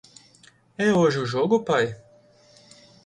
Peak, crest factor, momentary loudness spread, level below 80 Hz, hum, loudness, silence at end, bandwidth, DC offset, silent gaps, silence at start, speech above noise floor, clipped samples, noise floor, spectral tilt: -8 dBFS; 18 dB; 16 LU; -64 dBFS; none; -22 LUFS; 1.1 s; 10.5 kHz; under 0.1%; none; 0.8 s; 34 dB; under 0.1%; -56 dBFS; -6 dB/octave